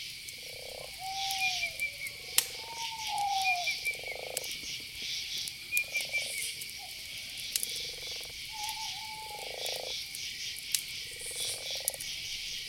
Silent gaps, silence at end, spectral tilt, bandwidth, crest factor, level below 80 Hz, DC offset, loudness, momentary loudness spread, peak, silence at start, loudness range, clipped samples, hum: none; 0 s; 1 dB/octave; over 20 kHz; 30 dB; -64 dBFS; under 0.1%; -34 LUFS; 10 LU; -6 dBFS; 0 s; 4 LU; under 0.1%; none